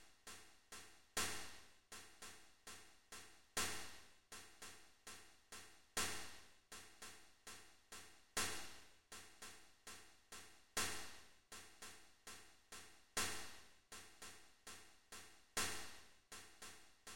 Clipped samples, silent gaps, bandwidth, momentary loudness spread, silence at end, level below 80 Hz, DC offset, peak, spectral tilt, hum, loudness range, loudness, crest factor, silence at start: under 0.1%; none; 16 kHz; 17 LU; 0 s; -72 dBFS; under 0.1%; -28 dBFS; -0.5 dB/octave; none; 3 LU; -51 LUFS; 24 dB; 0 s